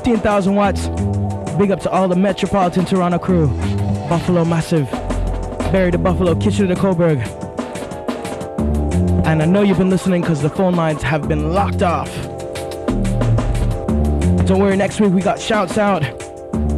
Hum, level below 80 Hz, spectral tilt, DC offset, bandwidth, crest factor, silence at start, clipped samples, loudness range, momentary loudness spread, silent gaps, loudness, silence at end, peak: none; -28 dBFS; -7 dB/octave; under 0.1%; 13 kHz; 12 dB; 0 s; under 0.1%; 2 LU; 10 LU; none; -17 LUFS; 0 s; -4 dBFS